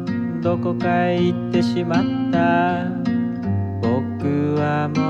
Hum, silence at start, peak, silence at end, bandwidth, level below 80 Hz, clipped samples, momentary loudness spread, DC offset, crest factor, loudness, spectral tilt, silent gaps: none; 0 s; -6 dBFS; 0 s; 8 kHz; -52 dBFS; under 0.1%; 5 LU; under 0.1%; 14 dB; -20 LUFS; -8 dB/octave; none